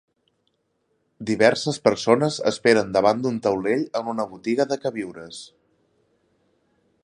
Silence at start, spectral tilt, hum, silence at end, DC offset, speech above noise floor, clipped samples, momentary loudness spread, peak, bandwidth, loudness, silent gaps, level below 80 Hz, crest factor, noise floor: 1.2 s; -5 dB/octave; none; 1.6 s; under 0.1%; 49 dB; under 0.1%; 15 LU; -2 dBFS; 11.5 kHz; -22 LUFS; none; -62 dBFS; 22 dB; -71 dBFS